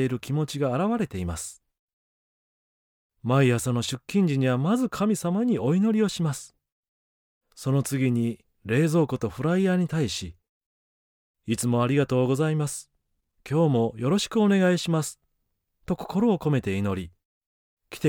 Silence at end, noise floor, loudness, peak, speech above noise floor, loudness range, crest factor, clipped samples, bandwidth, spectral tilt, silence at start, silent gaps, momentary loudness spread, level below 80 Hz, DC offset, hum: 0 s; -76 dBFS; -25 LUFS; -10 dBFS; 52 dB; 4 LU; 16 dB; under 0.1%; 18 kHz; -6 dB/octave; 0 s; 1.79-3.10 s, 6.72-7.41 s, 10.49-11.34 s, 17.25-17.77 s; 11 LU; -56 dBFS; under 0.1%; none